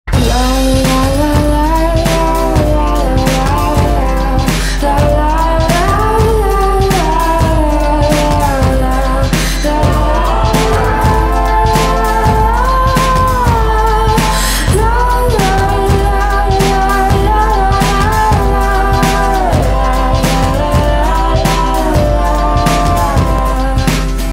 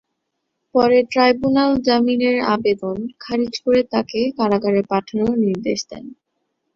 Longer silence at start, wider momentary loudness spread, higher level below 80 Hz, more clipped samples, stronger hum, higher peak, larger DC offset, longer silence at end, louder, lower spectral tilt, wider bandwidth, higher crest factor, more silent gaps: second, 0.05 s vs 0.75 s; second, 2 LU vs 9 LU; first, -14 dBFS vs -52 dBFS; neither; neither; about the same, 0 dBFS vs -2 dBFS; neither; second, 0 s vs 0.65 s; first, -12 LUFS vs -18 LUFS; about the same, -5.5 dB/octave vs -5.5 dB/octave; first, 16.5 kHz vs 7.4 kHz; second, 10 dB vs 16 dB; neither